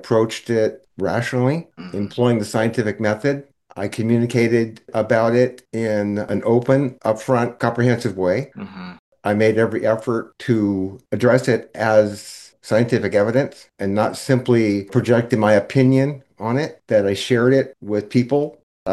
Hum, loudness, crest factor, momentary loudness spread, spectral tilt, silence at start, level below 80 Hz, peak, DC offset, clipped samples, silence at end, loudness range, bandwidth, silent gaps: none; -19 LUFS; 18 dB; 11 LU; -7 dB/octave; 0.05 s; -62 dBFS; -2 dBFS; under 0.1%; under 0.1%; 0 s; 3 LU; 12.5 kHz; 8.99-9.12 s, 18.63-18.86 s